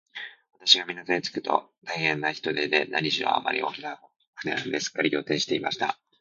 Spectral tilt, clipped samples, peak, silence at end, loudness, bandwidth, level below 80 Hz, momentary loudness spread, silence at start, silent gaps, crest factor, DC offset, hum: -3 dB/octave; under 0.1%; -2 dBFS; 0.3 s; -26 LUFS; 7.6 kHz; -72 dBFS; 16 LU; 0.15 s; 4.16-4.20 s, 4.27-4.33 s; 26 dB; under 0.1%; none